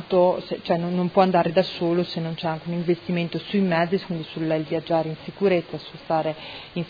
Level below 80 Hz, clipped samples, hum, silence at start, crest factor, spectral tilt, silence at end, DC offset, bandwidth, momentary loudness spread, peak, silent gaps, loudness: -60 dBFS; under 0.1%; none; 0 s; 20 dB; -8.5 dB/octave; 0 s; under 0.1%; 5 kHz; 9 LU; -4 dBFS; none; -24 LUFS